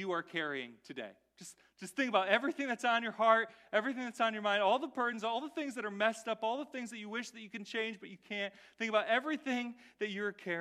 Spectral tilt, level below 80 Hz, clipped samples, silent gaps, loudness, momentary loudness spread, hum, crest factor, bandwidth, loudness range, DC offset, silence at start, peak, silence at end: -3.5 dB/octave; -86 dBFS; under 0.1%; none; -35 LUFS; 16 LU; none; 24 dB; 14 kHz; 6 LU; under 0.1%; 0 s; -12 dBFS; 0 s